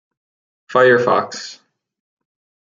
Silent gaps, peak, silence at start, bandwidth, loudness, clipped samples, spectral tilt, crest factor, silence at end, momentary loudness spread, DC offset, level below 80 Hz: none; -2 dBFS; 0.7 s; 7.6 kHz; -15 LUFS; under 0.1%; -4.5 dB/octave; 18 dB; 1.1 s; 18 LU; under 0.1%; -68 dBFS